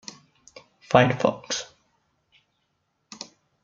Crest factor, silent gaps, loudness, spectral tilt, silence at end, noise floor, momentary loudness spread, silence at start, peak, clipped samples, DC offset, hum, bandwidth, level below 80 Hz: 26 dB; none; -23 LUFS; -4.5 dB/octave; 2 s; -74 dBFS; 23 LU; 0.9 s; -2 dBFS; under 0.1%; under 0.1%; none; 7.6 kHz; -62 dBFS